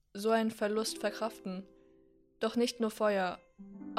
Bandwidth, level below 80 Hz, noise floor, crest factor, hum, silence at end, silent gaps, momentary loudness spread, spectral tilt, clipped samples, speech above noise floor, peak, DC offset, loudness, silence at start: 15.5 kHz; -72 dBFS; -65 dBFS; 18 dB; none; 0 s; none; 15 LU; -4 dB/octave; under 0.1%; 31 dB; -18 dBFS; under 0.1%; -34 LUFS; 0.15 s